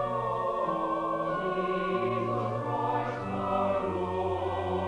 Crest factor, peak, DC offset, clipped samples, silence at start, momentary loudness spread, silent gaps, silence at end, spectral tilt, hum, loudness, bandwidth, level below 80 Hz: 14 dB; -16 dBFS; under 0.1%; under 0.1%; 0 s; 2 LU; none; 0 s; -7.5 dB/octave; none; -30 LUFS; 10.5 kHz; -56 dBFS